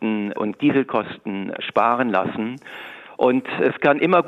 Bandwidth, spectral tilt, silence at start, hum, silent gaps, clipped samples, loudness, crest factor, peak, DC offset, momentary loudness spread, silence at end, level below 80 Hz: 7.4 kHz; -8 dB/octave; 0 s; none; none; under 0.1%; -21 LUFS; 18 dB; -4 dBFS; under 0.1%; 12 LU; 0 s; -66 dBFS